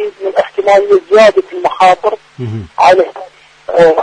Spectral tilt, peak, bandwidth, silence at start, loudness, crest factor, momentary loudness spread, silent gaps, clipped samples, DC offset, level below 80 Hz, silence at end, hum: -5 dB/octave; 0 dBFS; 10 kHz; 0 s; -10 LUFS; 10 dB; 15 LU; none; 0.1%; under 0.1%; -48 dBFS; 0 s; none